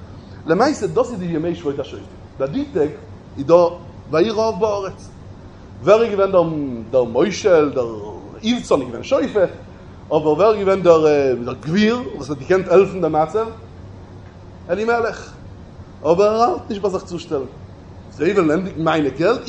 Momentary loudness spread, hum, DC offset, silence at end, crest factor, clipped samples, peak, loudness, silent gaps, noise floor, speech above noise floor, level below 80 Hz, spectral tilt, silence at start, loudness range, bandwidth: 22 LU; none; under 0.1%; 0 s; 18 dB; under 0.1%; 0 dBFS; -18 LUFS; none; -38 dBFS; 21 dB; -44 dBFS; -6 dB/octave; 0 s; 4 LU; 8.8 kHz